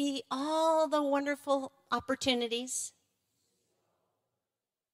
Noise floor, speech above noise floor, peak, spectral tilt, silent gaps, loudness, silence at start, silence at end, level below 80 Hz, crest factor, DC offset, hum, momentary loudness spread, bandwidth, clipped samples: under -90 dBFS; over 58 dB; -16 dBFS; -2 dB/octave; none; -32 LUFS; 0 s; 2.05 s; -72 dBFS; 18 dB; under 0.1%; none; 8 LU; 16 kHz; under 0.1%